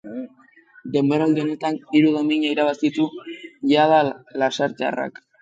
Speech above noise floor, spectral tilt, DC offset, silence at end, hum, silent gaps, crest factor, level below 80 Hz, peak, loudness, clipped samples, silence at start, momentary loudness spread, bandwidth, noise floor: 33 dB; -6 dB/octave; under 0.1%; 0.3 s; none; none; 16 dB; -70 dBFS; -4 dBFS; -20 LUFS; under 0.1%; 0.05 s; 17 LU; 7.8 kHz; -53 dBFS